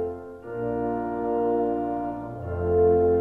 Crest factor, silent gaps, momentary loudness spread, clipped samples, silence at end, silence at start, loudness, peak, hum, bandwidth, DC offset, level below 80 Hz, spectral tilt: 14 dB; none; 13 LU; under 0.1%; 0 s; 0 s; -26 LUFS; -10 dBFS; none; 3 kHz; under 0.1%; -46 dBFS; -11 dB/octave